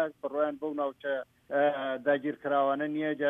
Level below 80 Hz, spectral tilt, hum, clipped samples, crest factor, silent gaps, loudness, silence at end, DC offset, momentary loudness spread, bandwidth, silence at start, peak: -78 dBFS; -7.5 dB/octave; none; under 0.1%; 16 dB; none; -31 LUFS; 0 s; under 0.1%; 6 LU; 3.8 kHz; 0 s; -14 dBFS